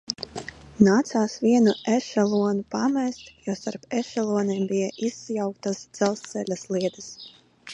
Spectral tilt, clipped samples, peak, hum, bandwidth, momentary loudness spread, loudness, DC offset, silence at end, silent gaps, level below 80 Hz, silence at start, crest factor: -5.5 dB/octave; under 0.1%; -4 dBFS; none; 9.6 kHz; 15 LU; -25 LUFS; under 0.1%; 0 s; none; -62 dBFS; 0.1 s; 22 dB